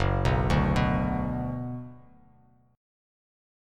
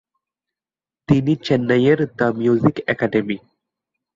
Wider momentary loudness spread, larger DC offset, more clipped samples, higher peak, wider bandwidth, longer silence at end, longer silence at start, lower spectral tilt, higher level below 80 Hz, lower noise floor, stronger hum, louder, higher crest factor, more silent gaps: first, 14 LU vs 6 LU; neither; neither; second, -12 dBFS vs -2 dBFS; first, 11.5 kHz vs 7.6 kHz; first, 1.8 s vs 0.8 s; second, 0 s vs 1.1 s; about the same, -7.5 dB/octave vs -8 dB/octave; first, -36 dBFS vs -52 dBFS; second, -60 dBFS vs under -90 dBFS; neither; second, -27 LUFS vs -18 LUFS; about the same, 18 dB vs 18 dB; neither